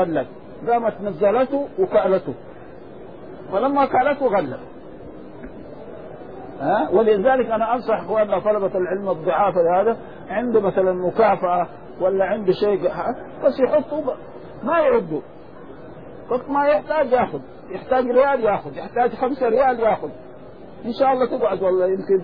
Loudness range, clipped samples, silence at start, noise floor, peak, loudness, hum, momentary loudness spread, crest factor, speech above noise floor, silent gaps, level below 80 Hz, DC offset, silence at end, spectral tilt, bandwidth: 4 LU; under 0.1%; 0 s; -40 dBFS; -4 dBFS; -20 LUFS; none; 21 LU; 16 dB; 21 dB; none; -52 dBFS; 0.6%; 0 s; -9.5 dB/octave; 5.2 kHz